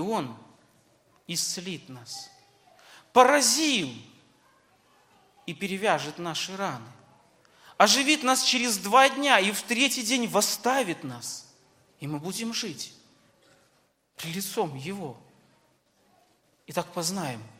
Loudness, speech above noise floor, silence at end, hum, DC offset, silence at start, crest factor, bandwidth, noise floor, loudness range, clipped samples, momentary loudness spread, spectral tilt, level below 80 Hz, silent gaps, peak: -25 LUFS; 42 dB; 0.1 s; none; under 0.1%; 0 s; 26 dB; 16.5 kHz; -68 dBFS; 14 LU; under 0.1%; 20 LU; -2 dB/octave; -76 dBFS; none; -2 dBFS